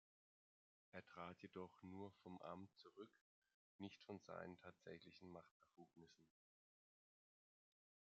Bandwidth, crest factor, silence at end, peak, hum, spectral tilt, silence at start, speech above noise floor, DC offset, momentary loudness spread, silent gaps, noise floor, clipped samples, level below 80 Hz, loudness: 7.2 kHz; 24 dB; 1.75 s; -38 dBFS; none; -5 dB/octave; 0.95 s; over 30 dB; under 0.1%; 7 LU; 3.21-3.42 s, 3.54-3.79 s, 5.51-5.60 s; under -90 dBFS; under 0.1%; under -90 dBFS; -60 LUFS